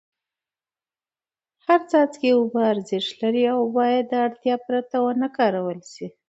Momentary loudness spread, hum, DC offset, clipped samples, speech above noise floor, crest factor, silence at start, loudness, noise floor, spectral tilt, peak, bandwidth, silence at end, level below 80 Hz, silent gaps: 8 LU; none; under 0.1%; under 0.1%; over 69 dB; 18 dB; 1.7 s; -22 LUFS; under -90 dBFS; -5.5 dB/octave; -4 dBFS; 8 kHz; 0.2 s; -74 dBFS; none